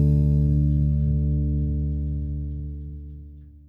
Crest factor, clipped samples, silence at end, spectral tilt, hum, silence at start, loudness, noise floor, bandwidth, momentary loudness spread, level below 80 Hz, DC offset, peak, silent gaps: 12 dB; under 0.1%; 0.15 s; -12.5 dB/octave; none; 0 s; -24 LUFS; -43 dBFS; 0.9 kHz; 17 LU; -26 dBFS; under 0.1%; -10 dBFS; none